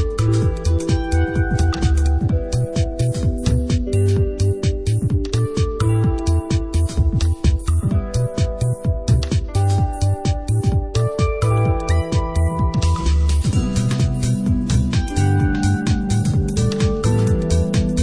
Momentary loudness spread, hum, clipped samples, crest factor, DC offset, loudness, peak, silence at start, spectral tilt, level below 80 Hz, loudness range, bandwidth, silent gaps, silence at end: 3 LU; none; under 0.1%; 12 dB; under 0.1%; -19 LUFS; -4 dBFS; 0 s; -6.5 dB/octave; -24 dBFS; 1 LU; 11 kHz; none; 0 s